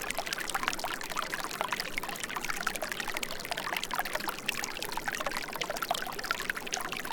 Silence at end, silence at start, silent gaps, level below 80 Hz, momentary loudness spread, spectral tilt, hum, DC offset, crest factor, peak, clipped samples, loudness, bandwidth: 0 s; 0 s; none; -52 dBFS; 3 LU; -1 dB/octave; none; under 0.1%; 28 dB; -8 dBFS; under 0.1%; -34 LUFS; 19 kHz